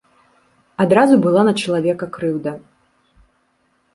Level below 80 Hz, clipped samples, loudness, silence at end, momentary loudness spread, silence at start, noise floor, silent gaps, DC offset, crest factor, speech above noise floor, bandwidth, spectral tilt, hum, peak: -60 dBFS; under 0.1%; -16 LUFS; 1.35 s; 16 LU; 0.8 s; -63 dBFS; none; under 0.1%; 16 dB; 48 dB; 11.5 kHz; -6.5 dB/octave; none; -2 dBFS